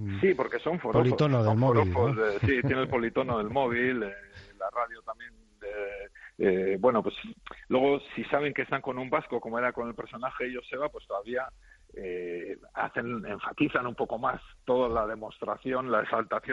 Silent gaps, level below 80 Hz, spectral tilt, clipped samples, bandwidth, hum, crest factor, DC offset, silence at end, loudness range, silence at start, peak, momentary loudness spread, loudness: none; -56 dBFS; -8.5 dB/octave; under 0.1%; 7.6 kHz; none; 18 dB; under 0.1%; 0 s; 8 LU; 0 s; -10 dBFS; 14 LU; -29 LUFS